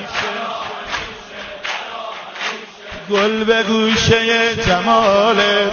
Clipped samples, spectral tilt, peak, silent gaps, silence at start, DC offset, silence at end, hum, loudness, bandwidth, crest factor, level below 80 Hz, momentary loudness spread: under 0.1%; -4 dB/octave; 0 dBFS; none; 0 s; under 0.1%; 0 s; none; -16 LUFS; 7 kHz; 16 dB; -42 dBFS; 16 LU